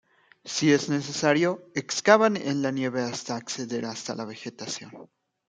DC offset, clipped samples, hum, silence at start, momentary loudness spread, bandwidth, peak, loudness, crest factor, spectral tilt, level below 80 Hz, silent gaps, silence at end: under 0.1%; under 0.1%; none; 0.45 s; 15 LU; 9.6 kHz; -2 dBFS; -26 LUFS; 24 dB; -4 dB/octave; -72 dBFS; none; 0.45 s